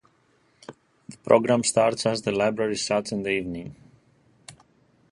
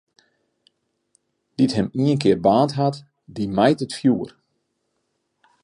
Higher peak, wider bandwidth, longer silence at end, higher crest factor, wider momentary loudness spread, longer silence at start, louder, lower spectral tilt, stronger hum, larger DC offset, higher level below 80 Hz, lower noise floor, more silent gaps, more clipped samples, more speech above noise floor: about the same, -4 dBFS vs -2 dBFS; about the same, 11.5 kHz vs 11 kHz; second, 0.6 s vs 1.35 s; about the same, 22 dB vs 20 dB; about the same, 16 LU vs 18 LU; second, 0.7 s vs 1.6 s; second, -23 LUFS vs -20 LUFS; second, -4 dB/octave vs -7 dB/octave; neither; neither; about the same, -60 dBFS vs -56 dBFS; second, -64 dBFS vs -73 dBFS; neither; neither; second, 41 dB vs 54 dB